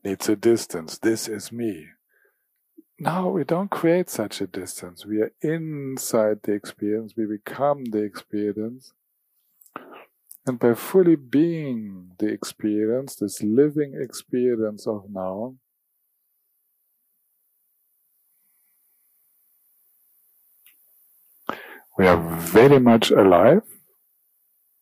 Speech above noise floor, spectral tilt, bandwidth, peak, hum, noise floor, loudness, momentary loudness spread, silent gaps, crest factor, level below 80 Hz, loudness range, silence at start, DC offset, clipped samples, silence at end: 51 dB; -6 dB/octave; 15.5 kHz; -4 dBFS; none; -73 dBFS; -22 LUFS; 17 LU; none; 20 dB; -60 dBFS; 12 LU; 0.05 s; under 0.1%; under 0.1%; 1.1 s